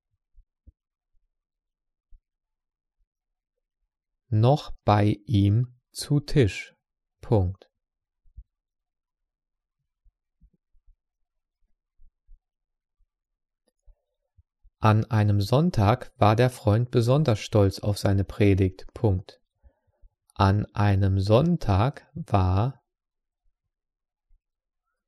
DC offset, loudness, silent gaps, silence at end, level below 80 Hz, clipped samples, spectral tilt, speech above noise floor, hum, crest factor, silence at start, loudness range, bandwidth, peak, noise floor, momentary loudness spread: under 0.1%; -24 LUFS; none; 2.35 s; -48 dBFS; under 0.1%; -7.5 dB/octave; 63 dB; none; 20 dB; 4.3 s; 9 LU; 12.5 kHz; -6 dBFS; -85 dBFS; 7 LU